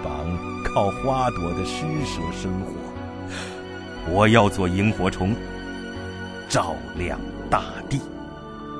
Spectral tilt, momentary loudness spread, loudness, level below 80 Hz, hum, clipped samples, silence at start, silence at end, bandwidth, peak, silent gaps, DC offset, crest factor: -5.5 dB/octave; 14 LU; -25 LUFS; -40 dBFS; none; under 0.1%; 0 s; 0 s; 11 kHz; 0 dBFS; none; under 0.1%; 24 dB